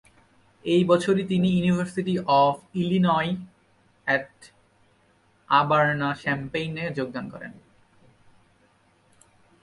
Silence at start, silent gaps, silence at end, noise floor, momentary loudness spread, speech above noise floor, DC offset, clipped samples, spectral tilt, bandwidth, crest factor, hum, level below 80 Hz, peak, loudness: 0.65 s; none; 2.1 s; -62 dBFS; 14 LU; 39 dB; under 0.1%; under 0.1%; -7 dB/octave; 11.5 kHz; 20 dB; none; -60 dBFS; -6 dBFS; -24 LUFS